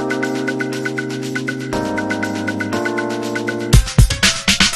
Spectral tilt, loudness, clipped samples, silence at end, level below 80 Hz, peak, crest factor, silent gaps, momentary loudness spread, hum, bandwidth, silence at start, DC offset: -4 dB/octave; -18 LUFS; under 0.1%; 0 s; -24 dBFS; 0 dBFS; 18 dB; none; 9 LU; none; 13.5 kHz; 0 s; under 0.1%